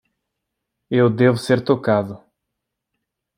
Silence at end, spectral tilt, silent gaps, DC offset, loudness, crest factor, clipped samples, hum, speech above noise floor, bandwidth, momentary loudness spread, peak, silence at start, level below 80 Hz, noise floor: 1.2 s; -7.5 dB/octave; none; under 0.1%; -18 LUFS; 18 dB; under 0.1%; none; 63 dB; 15.5 kHz; 7 LU; -2 dBFS; 0.9 s; -62 dBFS; -80 dBFS